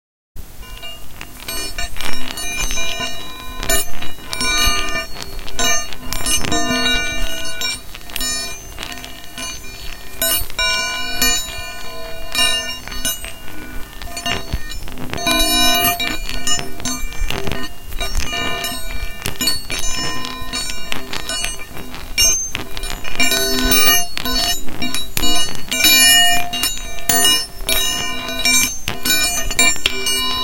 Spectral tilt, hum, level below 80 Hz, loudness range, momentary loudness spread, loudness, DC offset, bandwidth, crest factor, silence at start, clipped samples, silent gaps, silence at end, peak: -1 dB/octave; none; -30 dBFS; 9 LU; 17 LU; -17 LUFS; under 0.1%; 17 kHz; 16 dB; 0.35 s; under 0.1%; none; 0 s; 0 dBFS